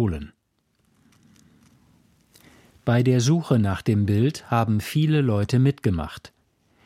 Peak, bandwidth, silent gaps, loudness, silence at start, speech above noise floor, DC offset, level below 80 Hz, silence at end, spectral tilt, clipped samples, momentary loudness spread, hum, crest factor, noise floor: -6 dBFS; 15 kHz; none; -22 LUFS; 0 s; 48 dB; under 0.1%; -48 dBFS; 0.6 s; -7 dB/octave; under 0.1%; 12 LU; none; 16 dB; -69 dBFS